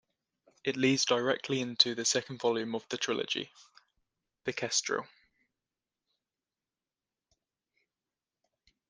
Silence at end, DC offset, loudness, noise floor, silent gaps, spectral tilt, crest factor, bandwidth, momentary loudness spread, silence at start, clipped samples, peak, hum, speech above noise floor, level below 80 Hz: 3.85 s; under 0.1%; -31 LUFS; under -90 dBFS; none; -2.5 dB/octave; 28 dB; 10 kHz; 10 LU; 0.65 s; under 0.1%; -8 dBFS; none; over 58 dB; -78 dBFS